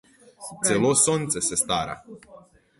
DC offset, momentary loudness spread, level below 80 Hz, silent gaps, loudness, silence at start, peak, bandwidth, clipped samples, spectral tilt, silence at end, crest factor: under 0.1%; 21 LU; -56 dBFS; none; -22 LUFS; 0.4 s; -6 dBFS; 12 kHz; under 0.1%; -3 dB/octave; 0.45 s; 20 dB